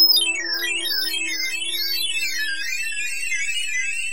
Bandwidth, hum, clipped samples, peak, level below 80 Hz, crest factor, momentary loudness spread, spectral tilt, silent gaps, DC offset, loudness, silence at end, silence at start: 17 kHz; none; under 0.1%; -8 dBFS; -68 dBFS; 16 dB; 4 LU; 2 dB/octave; none; 3%; -21 LUFS; 0 s; 0 s